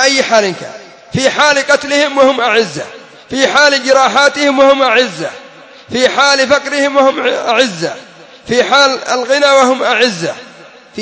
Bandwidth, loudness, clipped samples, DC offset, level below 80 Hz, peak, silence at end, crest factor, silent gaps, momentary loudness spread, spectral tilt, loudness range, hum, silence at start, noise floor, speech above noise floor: 8 kHz; -10 LUFS; 0.2%; under 0.1%; -52 dBFS; 0 dBFS; 0 s; 12 dB; none; 13 LU; -2.5 dB/octave; 2 LU; none; 0 s; -37 dBFS; 26 dB